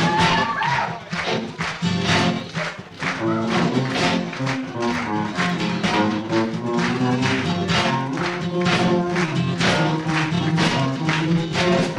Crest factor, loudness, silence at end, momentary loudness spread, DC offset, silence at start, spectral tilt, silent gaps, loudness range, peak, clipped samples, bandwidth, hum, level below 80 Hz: 16 dB; -21 LUFS; 0 s; 6 LU; under 0.1%; 0 s; -5.5 dB/octave; none; 2 LU; -6 dBFS; under 0.1%; 11 kHz; none; -50 dBFS